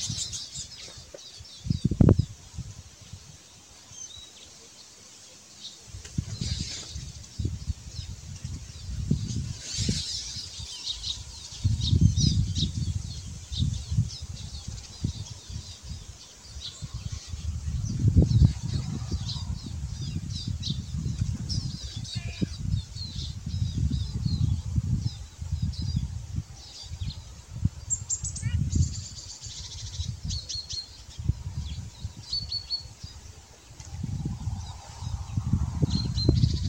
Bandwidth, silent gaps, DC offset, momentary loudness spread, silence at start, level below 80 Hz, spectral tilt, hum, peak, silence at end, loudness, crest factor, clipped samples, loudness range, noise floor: 16 kHz; none; under 0.1%; 18 LU; 0 s; -38 dBFS; -5 dB/octave; none; -6 dBFS; 0 s; -30 LUFS; 24 dB; under 0.1%; 9 LU; -51 dBFS